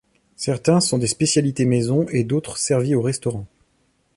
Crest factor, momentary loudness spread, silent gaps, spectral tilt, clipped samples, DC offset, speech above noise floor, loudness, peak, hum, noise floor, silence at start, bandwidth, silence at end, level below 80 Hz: 18 dB; 8 LU; none; -5 dB/octave; under 0.1%; under 0.1%; 45 dB; -20 LUFS; -4 dBFS; none; -64 dBFS; 0.4 s; 11.5 kHz; 0.7 s; -54 dBFS